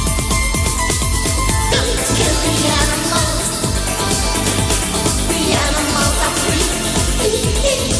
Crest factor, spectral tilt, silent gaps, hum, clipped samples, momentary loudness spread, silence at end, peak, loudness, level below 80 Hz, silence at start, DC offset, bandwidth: 14 dB; -3 dB/octave; none; none; under 0.1%; 2 LU; 0 s; -2 dBFS; -15 LUFS; -22 dBFS; 0 s; under 0.1%; 11 kHz